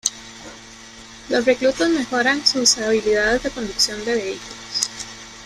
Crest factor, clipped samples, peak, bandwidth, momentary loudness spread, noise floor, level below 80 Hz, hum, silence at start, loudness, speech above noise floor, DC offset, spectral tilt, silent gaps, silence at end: 20 dB; under 0.1%; 0 dBFS; 15 kHz; 22 LU; -41 dBFS; -48 dBFS; none; 0.05 s; -19 LUFS; 21 dB; under 0.1%; -1.5 dB/octave; none; 0 s